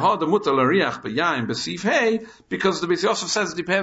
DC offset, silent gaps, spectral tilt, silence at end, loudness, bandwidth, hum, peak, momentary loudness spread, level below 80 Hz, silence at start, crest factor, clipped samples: under 0.1%; none; -4 dB/octave; 0 s; -21 LUFS; 8 kHz; none; -6 dBFS; 6 LU; -60 dBFS; 0 s; 16 dB; under 0.1%